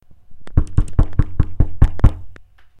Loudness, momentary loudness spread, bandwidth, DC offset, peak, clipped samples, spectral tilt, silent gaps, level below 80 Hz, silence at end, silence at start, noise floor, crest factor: -20 LUFS; 7 LU; 8.8 kHz; under 0.1%; 0 dBFS; under 0.1%; -9 dB/octave; none; -20 dBFS; 0.35 s; 0.3 s; -40 dBFS; 16 dB